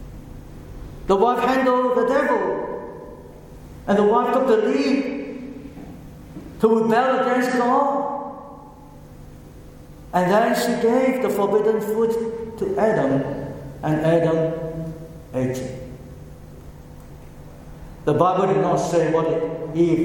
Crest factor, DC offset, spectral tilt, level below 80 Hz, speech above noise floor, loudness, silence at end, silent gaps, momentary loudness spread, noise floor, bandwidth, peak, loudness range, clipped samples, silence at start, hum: 18 dB; under 0.1%; -6.5 dB/octave; -46 dBFS; 23 dB; -20 LUFS; 0 s; none; 22 LU; -42 dBFS; 17.5 kHz; -2 dBFS; 4 LU; under 0.1%; 0 s; none